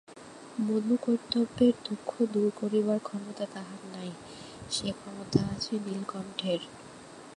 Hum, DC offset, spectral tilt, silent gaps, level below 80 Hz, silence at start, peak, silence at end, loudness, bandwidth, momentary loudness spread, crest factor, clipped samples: none; under 0.1%; -5.5 dB/octave; none; -62 dBFS; 0.1 s; -10 dBFS; 0 s; -31 LUFS; 11.5 kHz; 18 LU; 22 dB; under 0.1%